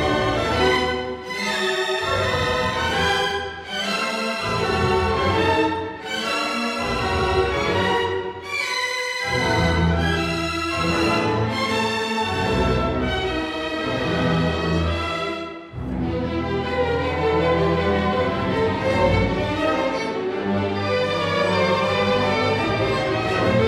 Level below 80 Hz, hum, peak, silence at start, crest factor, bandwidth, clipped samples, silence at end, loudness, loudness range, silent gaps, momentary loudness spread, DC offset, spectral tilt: -36 dBFS; none; -6 dBFS; 0 s; 16 dB; 15 kHz; under 0.1%; 0 s; -21 LUFS; 2 LU; none; 6 LU; under 0.1%; -5 dB/octave